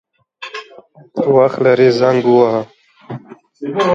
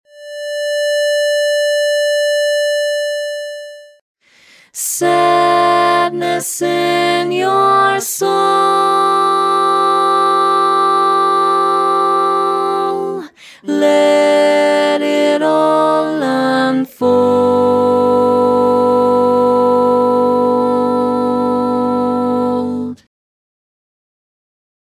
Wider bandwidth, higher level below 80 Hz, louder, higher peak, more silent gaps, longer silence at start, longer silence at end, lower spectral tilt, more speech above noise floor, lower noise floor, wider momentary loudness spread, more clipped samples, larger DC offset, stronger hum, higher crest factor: second, 7.6 kHz vs 16 kHz; second, -62 dBFS vs -56 dBFS; about the same, -13 LUFS vs -13 LUFS; about the same, 0 dBFS vs 0 dBFS; second, none vs 4.01-4.15 s; first, 0.4 s vs 0.15 s; second, 0 s vs 1.9 s; first, -7 dB/octave vs -3.5 dB/octave; about the same, 30 dB vs 33 dB; second, -42 dBFS vs -47 dBFS; first, 21 LU vs 8 LU; neither; neither; neither; about the same, 14 dB vs 14 dB